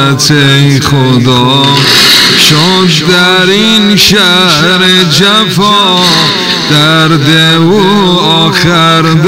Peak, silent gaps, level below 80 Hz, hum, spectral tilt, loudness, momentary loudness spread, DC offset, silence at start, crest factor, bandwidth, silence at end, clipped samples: 0 dBFS; none; -38 dBFS; none; -4 dB/octave; -4 LUFS; 3 LU; under 0.1%; 0 s; 6 dB; 16.5 kHz; 0 s; 4%